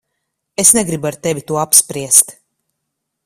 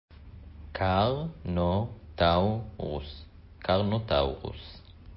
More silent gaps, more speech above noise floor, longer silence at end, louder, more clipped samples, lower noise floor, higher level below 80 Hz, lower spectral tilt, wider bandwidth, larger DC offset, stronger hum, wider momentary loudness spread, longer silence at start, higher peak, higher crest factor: neither; first, 61 dB vs 19 dB; first, 0.95 s vs 0 s; first, -12 LUFS vs -29 LUFS; first, 0.3% vs under 0.1%; first, -75 dBFS vs -47 dBFS; second, -54 dBFS vs -42 dBFS; second, -2.5 dB/octave vs -10.5 dB/octave; first, over 20 kHz vs 5.8 kHz; neither; neither; second, 11 LU vs 22 LU; first, 0.6 s vs 0.1 s; first, 0 dBFS vs -12 dBFS; about the same, 16 dB vs 18 dB